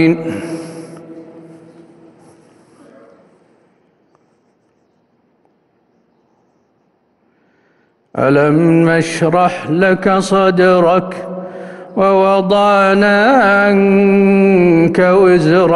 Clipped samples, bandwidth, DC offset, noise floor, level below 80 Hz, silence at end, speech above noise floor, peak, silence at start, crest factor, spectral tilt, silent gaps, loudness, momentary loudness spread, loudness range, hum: under 0.1%; 11.5 kHz; under 0.1%; -59 dBFS; -50 dBFS; 0 s; 48 dB; 0 dBFS; 0 s; 12 dB; -7 dB/octave; none; -11 LUFS; 17 LU; 11 LU; none